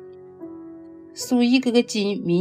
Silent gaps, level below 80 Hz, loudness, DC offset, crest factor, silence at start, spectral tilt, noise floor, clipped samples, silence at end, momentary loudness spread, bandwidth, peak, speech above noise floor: none; -70 dBFS; -21 LUFS; under 0.1%; 18 dB; 0 s; -5 dB/octave; -41 dBFS; under 0.1%; 0 s; 23 LU; 15 kHz; -6 dBFS; 21 dB